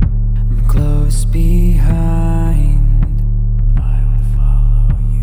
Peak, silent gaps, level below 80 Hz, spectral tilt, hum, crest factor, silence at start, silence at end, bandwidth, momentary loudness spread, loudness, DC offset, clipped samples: 0 dBFS; none; -12 dBFS; -8 dB/octave; none; 10 dB; 0 s; 0 s; 11 kHz; 3 LU; -15 LUFS; under 0.1%; under 0.1%